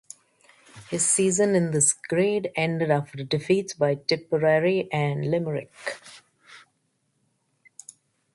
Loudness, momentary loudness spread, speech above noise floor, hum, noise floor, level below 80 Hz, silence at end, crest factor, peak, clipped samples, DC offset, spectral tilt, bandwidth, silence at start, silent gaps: -24 LUFS; 14 LU; 49 dB; none; -72 dBFS; -66 dBFS; 1.75 s; 20 dB; -6 dBFS; under 0.1%; under 0.1%; -4 dB/octave; 11.5 kHz; 0.75 s; none